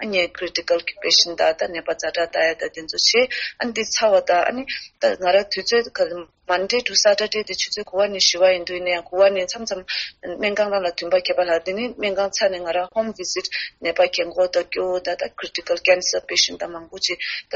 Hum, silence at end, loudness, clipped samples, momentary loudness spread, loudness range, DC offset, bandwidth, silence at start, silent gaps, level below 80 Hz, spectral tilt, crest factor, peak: none; 0 s; -20 LUFS; under 0.1%; 9 LU; 3 LU; under 0.1%; 8 kHz; 0 s; none; -58 dBFS; 0.5 dB/octave; 18 dB; -2 dBFS